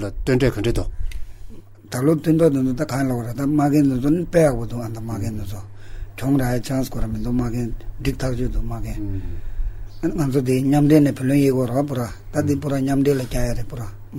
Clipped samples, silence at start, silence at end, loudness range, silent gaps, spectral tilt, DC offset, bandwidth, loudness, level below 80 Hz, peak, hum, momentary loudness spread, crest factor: under 0.1%; 0 s; 0 s; 6 LU; none; -7.5 dB/octave; under 0.1%; 16 kHz; -21 LUFS; -30 dBFS; -2 dBFS; none; 16 LU; 18 dB